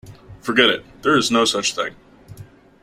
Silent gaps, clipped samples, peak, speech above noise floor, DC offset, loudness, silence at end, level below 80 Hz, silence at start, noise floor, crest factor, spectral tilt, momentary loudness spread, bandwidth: none; under 0.1%; -2 dBFS; 24 dB; under 0.1%; -18 LUFS; 0.4 s; -54 dBFS; 0.05 s; -43 dBFS; 20 dB; -2.5 dB/octave; 12 LU; 15.5 kHz